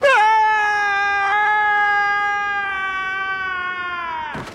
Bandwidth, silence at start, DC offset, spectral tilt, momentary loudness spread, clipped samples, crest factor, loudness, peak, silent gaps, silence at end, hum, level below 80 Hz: 11 kHz; 0 s; under 0.1%; -2 dB/octave; 10 LU; under 0.1%; 14 dB; -18 LUFS; -4 dBFS; none; 0 s; none; -54 dBFS